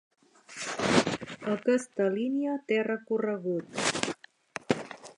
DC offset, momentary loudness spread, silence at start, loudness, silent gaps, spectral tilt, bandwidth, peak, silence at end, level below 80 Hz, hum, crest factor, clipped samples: under 0.1%; 11 LU; 0.5 s; -30 LUFS; none; -4 dB/octave; 11.5 kHz; -4 dBFS; 0.05 s; -66 dBFS; none; 26 dB; under 0.1%